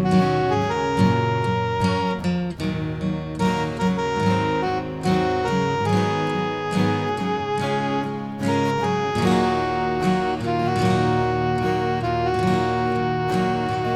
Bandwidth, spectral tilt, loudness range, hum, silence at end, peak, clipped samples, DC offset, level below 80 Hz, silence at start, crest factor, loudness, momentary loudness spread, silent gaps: 12.5 kHz; -6.5 dB/octave; 2 LU; none; 0 s; -6 dBFS; under 0.1%; 0.2%; -44 dBFS; 0 s; 16 dB; -22 LUFS; 5 LU; none